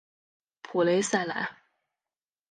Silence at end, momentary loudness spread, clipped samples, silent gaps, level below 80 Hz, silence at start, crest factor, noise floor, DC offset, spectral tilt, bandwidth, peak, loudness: 1 s; 9 LU; under 0.1%; none; -78 dBFS; 0.65 s; 20 dB; under -90 dBFS; under 0.1%; -4 dB/octave; 10 kHz; -10 dBFS; -28 LUFS